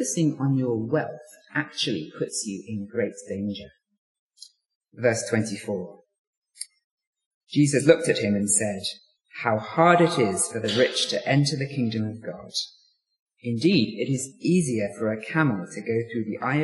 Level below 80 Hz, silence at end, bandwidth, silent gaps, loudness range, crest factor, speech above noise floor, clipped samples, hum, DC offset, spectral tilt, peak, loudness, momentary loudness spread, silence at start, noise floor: -68 dBFS; 0 s; 11.5 kHz; 3.98-4.30 s, 4.75-4.81 s, 6.19-6.42 s, 6.84-6.98 s, 7.07-7.13 s, 7.26-7.41 s, 13.19-13.26 s; 9 LU; 24 dB; 28 dB; under 0.1%; none; under 0.1%; -4.5 dB/octave; -2 dBFS; -25 LUFS; 13 LU; 0 s; -52 dBFS